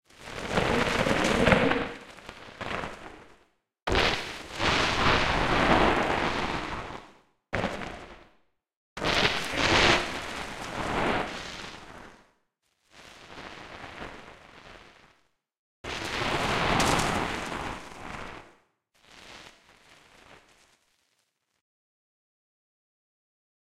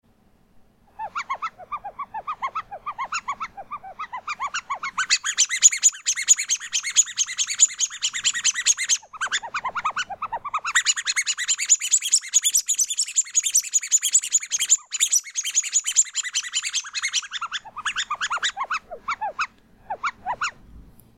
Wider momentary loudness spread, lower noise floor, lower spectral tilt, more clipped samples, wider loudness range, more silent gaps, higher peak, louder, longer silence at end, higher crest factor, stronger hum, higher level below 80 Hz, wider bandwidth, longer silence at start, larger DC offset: first, 23 LU vs 14 LU; first, -76 dBFS vs -59 dBFS; first, -4 dB/octave vs 4 dB/octave; neither; first, 19 LU vs 12 LU; first, 3.82-3.86 s, 8.77-8.96 s, 15.59-15.84 s vs none; about the same, -4 dBFS vs -2 dBFS; second, -26 LUFS vs -21 LUFS; first, 3.25 s vs 0.35 s; about the same, 26 dB vs 22 dB; neither; first, -44 dBFS vs -62 dBFS; about the same, 16 kHz vs 16 kHz; second, 0.2 s vs 1 s; neither